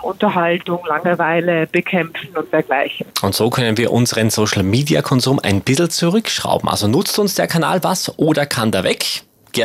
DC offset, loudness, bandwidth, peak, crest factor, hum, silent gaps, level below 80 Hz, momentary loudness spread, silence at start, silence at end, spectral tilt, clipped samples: under 0.1%; -16 LUFS; 16 kHz; 0 dBFS; 16 dB; none; none; -56 dBFS; 5 LU; 0 s; 0 s; -4.5 dB/octave; under 0.1%